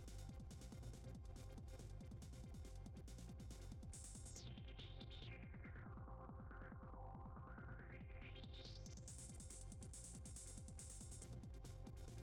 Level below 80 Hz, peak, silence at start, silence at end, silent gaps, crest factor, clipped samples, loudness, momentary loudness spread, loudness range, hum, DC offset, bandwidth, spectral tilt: -58 dBFS; -44 dBFS; 0 s; 0 s; none; 12 dB; under 0.1%; -57 LUFS; 2 LU; 1 LU; none; under 0.1%; 17.5 kHz; -4.5 dB/octave